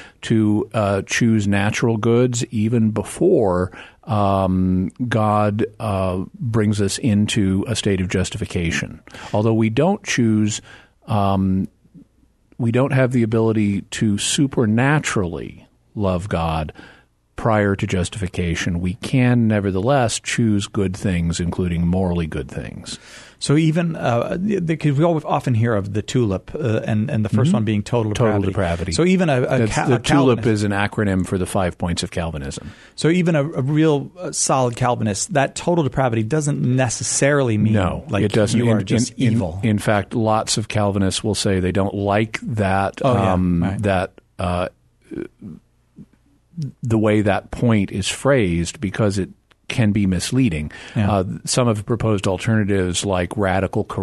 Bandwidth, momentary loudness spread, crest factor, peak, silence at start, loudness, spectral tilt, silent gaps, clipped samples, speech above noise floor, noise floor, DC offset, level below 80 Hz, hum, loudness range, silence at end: 12.5 kHz; 8 LU; 16 dB; -2 dBFS; 0 s; -19 LUFS; -5.5 dB/octave; none; under 0.1%; 37 dB; -56 dBFS; under 0.1%; -42 dBFS; none; 3 LU; 0 s